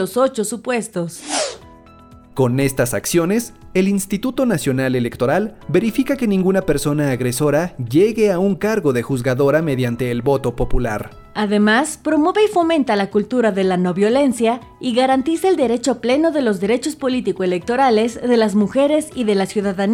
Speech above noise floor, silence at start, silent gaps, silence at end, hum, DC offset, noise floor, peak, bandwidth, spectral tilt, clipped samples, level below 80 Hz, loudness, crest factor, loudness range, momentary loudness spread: 26 dB; 0 s; none; 0 s; none; under 0.1%; -43 dBFS; -4 dBFS; over 20 kHz; -5.5 dB/octave; under 0.1%; -38 dBFS; -18 LUFS; 12 dB; 3 LU; 6 LU